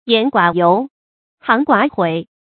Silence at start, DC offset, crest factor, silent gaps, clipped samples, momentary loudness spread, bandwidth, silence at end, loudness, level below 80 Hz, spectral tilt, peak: 0.05 s; under 0.1%; 16 dB; 0.90-1.37 s; under 0.1%; 8 LU; 4.7 kHz; 0.25 s; -15 LUFS; -62 dBFS; -9 dB/octave; 0 dBFS